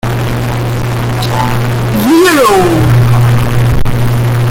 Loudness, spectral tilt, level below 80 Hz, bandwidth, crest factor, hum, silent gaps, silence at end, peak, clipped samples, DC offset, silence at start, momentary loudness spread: -10 LUFS; -6 dB/octave; -22 dBFS; 17 kHz; 8 dB; none; none; 0 s; 0 dBFS; under 0.1%; under 0.1%; 0.05 s; 8 LU